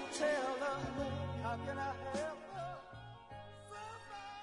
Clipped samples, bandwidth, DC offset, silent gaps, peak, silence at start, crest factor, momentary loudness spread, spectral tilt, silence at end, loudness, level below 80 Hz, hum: under 0.1%; 11 kHz; under 0.1%; none; -24 dBFS; 0 s; 18 dB; 17 LU; -5 dB/octave; 0 s; -41 LUFS; -64 dBFS; none